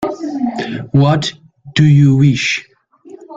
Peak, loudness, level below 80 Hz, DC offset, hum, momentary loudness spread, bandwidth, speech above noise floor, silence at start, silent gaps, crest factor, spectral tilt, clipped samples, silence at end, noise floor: 0 dBFS; -14 LUFS; -46 dBFS; under 0.1%; none; 12 LU; 7.8 kHz; 28 dB; 0 s; none; 14 dB; -6.5 dB/octave; under 0.1%; 0 s; -40 dBFS